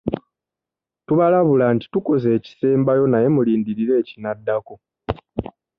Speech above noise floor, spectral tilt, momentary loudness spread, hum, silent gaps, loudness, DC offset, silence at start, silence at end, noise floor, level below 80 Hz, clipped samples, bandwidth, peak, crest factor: 70 dB; -10.5 dB/octave; 14 LU; none; none; -19 LUFS; under 0.1%; 0.05 s; 0.35 s; -87 dBFS; -48 dBFS; under 0.1%; 5.4 kHz; -4 dBFS; 16 dB